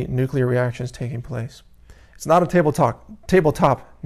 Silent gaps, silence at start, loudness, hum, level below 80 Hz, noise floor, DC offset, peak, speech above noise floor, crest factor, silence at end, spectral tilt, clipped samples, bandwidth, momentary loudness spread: none; 0 s; -20 LUFS; none; -44 dBFS; -46 dBFS; under 0.1%; -4 dBFS; 26 dB; 18 dB; 0.2 s; -7 dB/octave; under 0.1%; 14 kHz; 14 LU